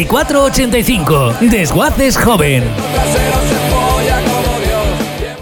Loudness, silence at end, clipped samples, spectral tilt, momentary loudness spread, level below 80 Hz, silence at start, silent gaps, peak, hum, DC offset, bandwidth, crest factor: -12 LUFS; 0 s; under 0.1%; -4.5 dB/octave; 5 LU; -22 dBFS; 0 s; none; 0 dBFS; none; under 0.1%; over 20 kHz; 12 dB